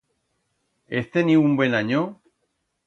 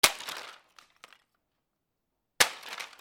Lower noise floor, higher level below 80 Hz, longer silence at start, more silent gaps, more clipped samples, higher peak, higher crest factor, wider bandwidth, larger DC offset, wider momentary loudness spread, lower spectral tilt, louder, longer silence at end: second, -74 dBFS vs -83 dBFS; about the same, -66 dBFS vs -64 dBFS; first, 0.9 s vs 0.05 s; neither; neither; second, -6 dBFS vs -2 dBFS; second, 18 dB vs 32 dB; second, 7 kHz vs over 20 kHz; neither; second, 11 LU vs 16 LU; first, -7.5 dB/octave vs 1 dB/octave; first, -21 LUFS vs -28 LUFS; first, 0.75 s vs 0.15 s